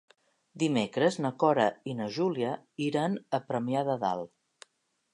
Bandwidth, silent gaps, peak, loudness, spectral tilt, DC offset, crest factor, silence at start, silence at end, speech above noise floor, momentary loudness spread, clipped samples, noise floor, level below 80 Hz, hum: 11 kHz; none; -10 dBFS; -30 LUFS; -6 dB/octave; under 0.1%; 20 dB; 0.55 s; 0.85 s; 46 dB; 8 LU; under 0.1%; -75 dBFS; -76 dBFS; none